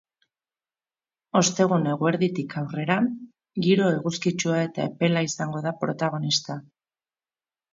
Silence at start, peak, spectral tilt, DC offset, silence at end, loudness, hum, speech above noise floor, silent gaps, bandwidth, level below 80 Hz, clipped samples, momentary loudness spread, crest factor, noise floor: 1.35 s; -6 dBFS; -5 dB/octave; under 0.1%; 1.15 s; -24 LUFS; none; over 66 dB; none; 7.8 kHz; -68 dBFS; under 0.1%; 9 LU; 20 dB; under -90 dBFS